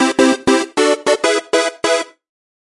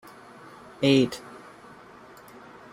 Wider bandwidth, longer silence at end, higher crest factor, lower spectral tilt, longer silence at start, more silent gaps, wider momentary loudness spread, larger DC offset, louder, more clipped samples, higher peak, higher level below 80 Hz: second, 11.5 kHz vs 15.5 kHz; second, 0.55 s vs 1.35 s; second, 16 dB vs 22 dB; second, -2 dB/octave vs -6 dB/octave; second, 0 s vs 0.8 s; neither; second, 5 LU vs 27 LU; neither; first, -15 LUFS vs -23 LUFS; neither; first, 0 dBFS vs -8 dBFS; first, -52 dBFS vs -64 dBFS